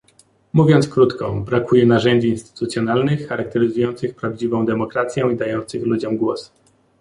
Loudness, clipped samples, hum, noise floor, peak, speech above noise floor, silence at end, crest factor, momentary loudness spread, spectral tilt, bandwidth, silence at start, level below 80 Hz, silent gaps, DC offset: -19 LUFS; under 0.1%; none; -55 dBFS; -2 dBFS; 38 dB; 0.55 s; 16 dB; 10 LU; -7 dB/octave; 11.5 kHz; 0.55 s; -52 dBFS; none; under 0.1%